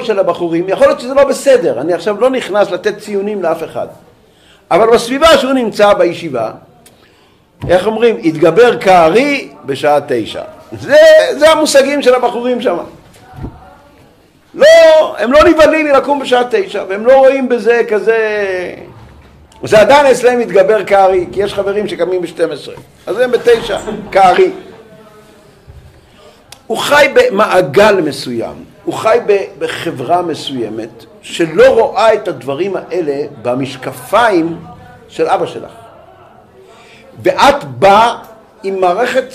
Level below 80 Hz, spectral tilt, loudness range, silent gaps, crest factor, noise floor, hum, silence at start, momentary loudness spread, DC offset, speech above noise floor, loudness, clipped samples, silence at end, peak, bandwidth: -44 dBFS; -4.5 dB/octave; 6 LU; none; 12 dB; -47 dBFS; none; 0 s; 15 LU; under 0.1%; 37 dB; -10 LUFS; under 0.1%; 0 s; 0 dBFS; 15.5 kHz